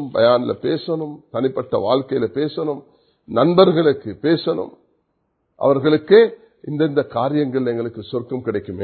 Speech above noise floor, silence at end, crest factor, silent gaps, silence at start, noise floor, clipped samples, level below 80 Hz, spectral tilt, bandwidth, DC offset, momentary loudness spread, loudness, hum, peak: 51 dB; 0 s; 18 dB; none; 0 s; -69 dBFS; under 0.1%; -56 dBFS; -11.5 dB/octave; 4.6 kHz; under 0.1%; 13 LU; -19 LUFS; none; 0 dBFS